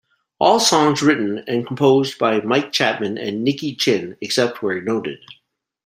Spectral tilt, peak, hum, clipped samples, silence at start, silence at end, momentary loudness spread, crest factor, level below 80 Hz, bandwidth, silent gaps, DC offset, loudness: -4 dB/octave; 0 dBFS; none; under 0.1%; 0.4 s; 0.5 s; 9 LU; 18 dB; -62 dBFS; 16 kHz; none; under 0.1%; -18 LUFS